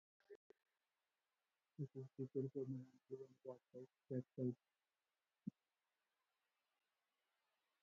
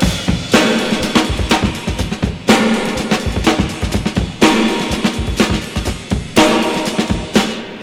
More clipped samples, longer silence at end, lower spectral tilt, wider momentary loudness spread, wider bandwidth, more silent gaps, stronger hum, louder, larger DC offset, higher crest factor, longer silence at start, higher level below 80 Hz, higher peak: neither; first, 2.3 s vs 0 s; first, -11.5 dB/octave vs -4.5 dB/octave; first, 20 LU vs 8 LU; second, 7.2 kHz vs 16.5 kHz; first, 0.36-0.50 s vs none; neither; second, -52 LUFS vs -15 LUFS; neither; about the same, 20 dB vs 16 dB; first, 0.3 s vs 0 s; second, under -90 dBFS vs -26 dBFS; second, -34 dBFS vs 0 dBFS